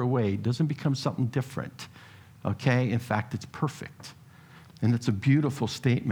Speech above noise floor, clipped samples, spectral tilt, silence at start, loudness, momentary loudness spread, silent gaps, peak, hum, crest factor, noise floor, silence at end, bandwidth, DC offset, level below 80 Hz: 24 dB; under 0.1%; -7 dB/octave; 0 s; -28 LUFS; 17 LU; none; -8 dBFS; none; 20 dB; -51 dBFS; 0 s; 15.5 kHz; under 0.1%; -64 dBFS